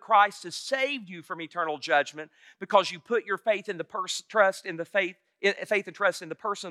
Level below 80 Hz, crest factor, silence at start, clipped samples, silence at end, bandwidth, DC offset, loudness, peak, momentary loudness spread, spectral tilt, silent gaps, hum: under -90 dBFS; 22 dB; 0.1 s; under 0.1%; 0 s; 13.5 kHz; under 0.1%; -28 LUFS; -6 dBFS; 11 LU; -2.5 dB/octave; none; none